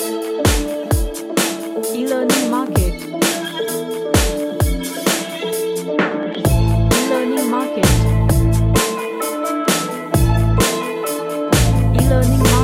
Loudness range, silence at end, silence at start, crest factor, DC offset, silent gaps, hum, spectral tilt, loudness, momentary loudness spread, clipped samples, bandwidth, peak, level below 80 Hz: 3 LU; 0 s; 0 s; 16 dB; under 0.1%; none; none; -5 dB/octave; -17 LUFS; 7 LU; under 0.1%; 16.5 kHz; 0 dBFS; -24 dBFS